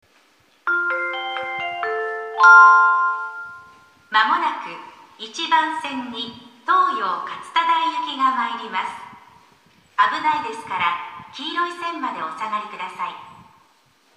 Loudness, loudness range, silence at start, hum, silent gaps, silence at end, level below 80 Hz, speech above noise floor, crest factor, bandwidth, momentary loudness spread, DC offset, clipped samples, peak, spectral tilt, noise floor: -19 LUFS; 9 LU; 0.65 s; none; none; 0.85 s; -72 dBFS; 39 dB; 22 dB; 10.5 kHz; 17 LU; under 0.1%; under 0.1%; 0 dBFS; -2 dB/octave; -58 dBFS